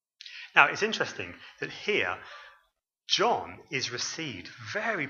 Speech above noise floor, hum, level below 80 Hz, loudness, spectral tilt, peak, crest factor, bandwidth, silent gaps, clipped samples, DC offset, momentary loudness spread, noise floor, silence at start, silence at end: 43 dB; none; -72 dBFS; -28 LUFS; -2.5 dB/octave; -2 dBFS; 28 dB; 7.6 kHz; none; under 0.1%; under 0.1%; 19 LU; -73 dBFS; 0.25 s; 0 s